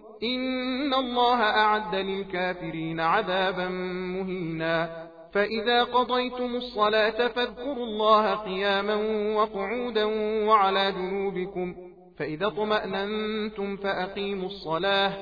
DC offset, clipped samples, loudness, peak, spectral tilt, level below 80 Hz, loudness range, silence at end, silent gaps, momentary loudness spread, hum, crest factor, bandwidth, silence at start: under 0.1%; under 0.1%; -26 LUFS; -8 dBFS; -6.5 dB/octave; -56 dBFS; 4 LU; 0 s; none; 10 LU; none; 18 dB; 5 kHz; 0 s